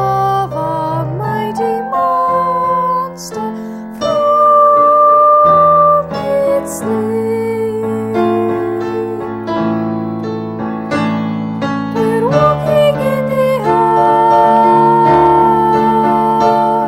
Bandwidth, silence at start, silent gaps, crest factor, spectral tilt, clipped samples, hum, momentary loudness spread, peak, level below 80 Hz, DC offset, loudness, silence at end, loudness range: 16.5 kHz; 0 s; none; 12 dB; -7 dB/octave; under 0.1%; none; 12 LU; 0 dBFS; -44 dBFS; under 0.1%; -12 LUFS; 0 s; 8 LU